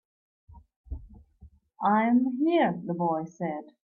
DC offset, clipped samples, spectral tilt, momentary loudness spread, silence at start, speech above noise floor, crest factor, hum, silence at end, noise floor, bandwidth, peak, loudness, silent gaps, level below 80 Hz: under 0.1%; under 0.1%; -8.5 dB/octave; 21 LU; 0.55 s; 29 dB; 16 dB; none; 0.25 s; -55 dBFS; 7 kHz; -12 dBFS; -27 LUFS; 0.76-0.84 s; -52 dBFS